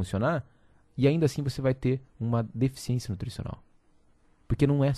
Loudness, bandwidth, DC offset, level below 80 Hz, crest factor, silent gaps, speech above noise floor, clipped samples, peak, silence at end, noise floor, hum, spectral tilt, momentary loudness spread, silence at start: -29 LUFS; 13 kHz; under 0.1%; -48 dBFS; 20 dB; none; 35 dB; under 0.1%; -10 dBFS; 0 s; -62 dBFS; none; -7.5 dB/octave; 13 LU; 0 s